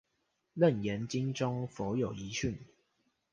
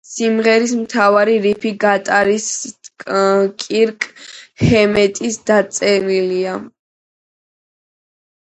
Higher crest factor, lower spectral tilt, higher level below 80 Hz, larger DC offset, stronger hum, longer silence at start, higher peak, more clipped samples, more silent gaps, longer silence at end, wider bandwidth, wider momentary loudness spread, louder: about the same, 20 dB vs 16 dB; first, -6 dB/octave vs -4.5 dB/octave; second, -60 dBFS vs -46 dBFS; neither; neither; first, 0.55 s vs 0.1 s; second, -14 dBFS vs 0 dBFS; neither; neither; second, 0.65 s vs 1.8 s; about the same, 9.8 kHz vs 9 kHz; second, 9 LU vs 12 LU; second, -34 LUFS vs -15 LUFS